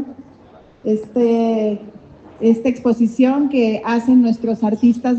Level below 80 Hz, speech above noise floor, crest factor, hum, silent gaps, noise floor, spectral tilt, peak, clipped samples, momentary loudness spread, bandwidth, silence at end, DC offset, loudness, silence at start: -58 dBFS; 30 dB; 14 dB; none; none; -45 dBFS; -7.5 dB/octave; -2 dBFS; under 0.1%; 8 LU; 7.6 kHz; 0 s; under 0.1%; -16 LUFS; 0 s